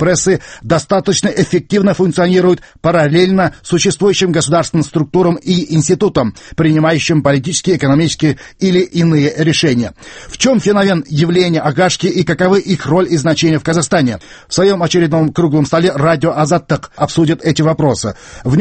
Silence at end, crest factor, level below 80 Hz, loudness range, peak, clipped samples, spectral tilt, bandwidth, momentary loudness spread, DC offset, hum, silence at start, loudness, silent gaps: 0 s; 12 dB; -42 dBFS; 1 LU; 0 dBFS; under 0.1%; -5.5 dB/octave; 8.8 kHz; 5 LU; under 0.1%; none; 0 s; -13 LUFS; none